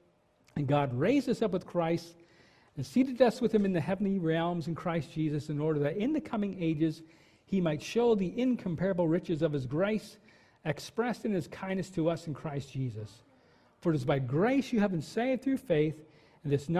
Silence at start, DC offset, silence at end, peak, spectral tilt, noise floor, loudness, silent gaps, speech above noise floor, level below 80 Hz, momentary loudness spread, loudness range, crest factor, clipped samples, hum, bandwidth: 0.55 s; under 0.1%; 0 s; -12 dBFS; -7.5 dB/octave; -67 dBFS; -31 LUFS; none; 36 dB; -62 dBFS; 10 LU; 4 LU; 20 dB; under 0.1%; none; 14 kHz